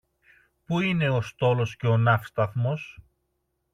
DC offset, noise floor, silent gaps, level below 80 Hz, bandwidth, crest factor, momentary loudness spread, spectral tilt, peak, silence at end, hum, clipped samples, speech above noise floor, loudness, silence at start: under 0.1%; -76 dBFS; none; -58 dBFS; 6.8 kHz; 18 dB; 8 LU; -7.5 dB/octave; -8 dBFS; 0.8 s; none; under 0.1%; 52 dB; -25 LUFS; 0.7 s